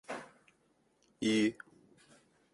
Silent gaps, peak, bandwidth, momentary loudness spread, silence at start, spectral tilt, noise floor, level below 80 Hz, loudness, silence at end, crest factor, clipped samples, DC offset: none; -20 dBFS; 11.5 kHz; 26 LU; 0.1 s; -4.5 dB/octave; -73 dBFS; -76 dBFS; -34 LUFS; 1 s; 18 dB; under 0.1%; under 0.1%